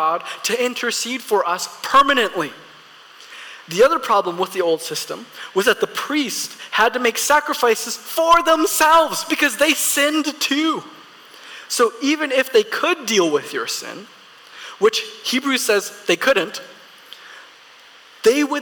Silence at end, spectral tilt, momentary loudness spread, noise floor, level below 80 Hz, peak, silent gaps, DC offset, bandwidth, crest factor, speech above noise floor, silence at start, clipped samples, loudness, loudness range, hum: 0 s; -1.5 dB/octave; 13 LU; -46 dBFS; -60 dBFS; -6 dBFS; none; under 0.1%; 19 kHz; 14 dB; 27 dB; 0 s; under 0.1%; -18 LUFS; 5 LU; none